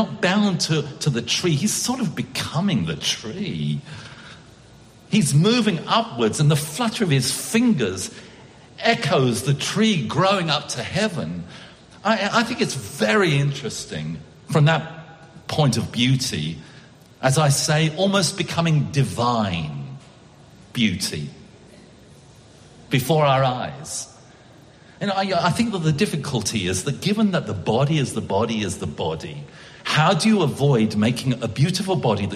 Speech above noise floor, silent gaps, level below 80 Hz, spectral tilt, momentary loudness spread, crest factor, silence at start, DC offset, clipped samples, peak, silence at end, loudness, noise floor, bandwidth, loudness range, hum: 27 dB; none; -54 dBFS; -5 dB/octave; 13 LU; 18 dB; 0 s; under 0.1%; under 0.1%; -2 dBFS; 0 s; -21 LUFS; -48 dBFS; 15 kHz; 4 LU; none